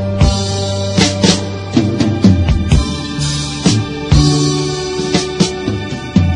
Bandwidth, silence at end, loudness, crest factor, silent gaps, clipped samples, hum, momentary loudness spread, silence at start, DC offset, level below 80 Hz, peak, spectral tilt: 11 kHz; 0 s; -14 LUFS; 14 dB; none; under 0.1%; none; 7 LU; 0 s; under 0.1%; -24 dBFS; 0 dBFS; -5 dB/octave